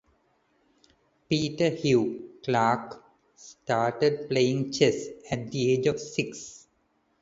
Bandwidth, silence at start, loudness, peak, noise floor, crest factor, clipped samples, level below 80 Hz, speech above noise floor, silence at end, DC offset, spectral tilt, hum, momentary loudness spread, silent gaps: 8 kHz; 1.3 s; -27 LUFS; -8 dBFS; -70 dBFS; 20 dB; under 0.1%; -64 dBFS; 44 dB; 0.65 s; under 0.1%; -5.5 dB/octave; none; 12 LU; none